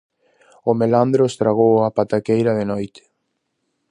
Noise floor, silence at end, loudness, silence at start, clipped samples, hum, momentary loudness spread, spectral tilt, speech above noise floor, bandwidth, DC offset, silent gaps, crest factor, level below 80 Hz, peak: -73 dBFS; 1.05 s; -18 LUFS; 0.65 s; under 0.1%; none; 10 LU; -7.5 dB/octave; 56 dB; 10.5 kHz; under 0.1%; none; 18 dB; -58 dBFS; -2 dBFS